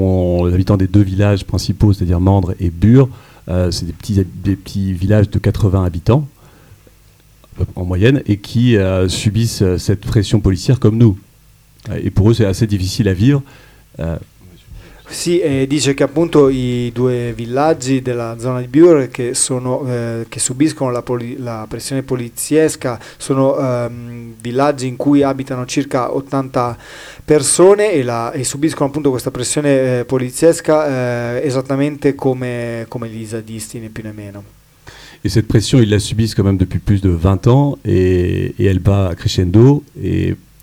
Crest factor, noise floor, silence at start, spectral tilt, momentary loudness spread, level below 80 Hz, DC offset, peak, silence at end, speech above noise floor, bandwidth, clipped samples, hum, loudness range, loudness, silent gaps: 14 dB; -47 dBFS; 0 s; -6 dB/octave; 12 LU; -34 dBFS; under 0.1%; 0 dBFS; 0.25 s; 33 dB; 15.5 kHz; under 0.1%; none; 4 LU; -15 LUFS; none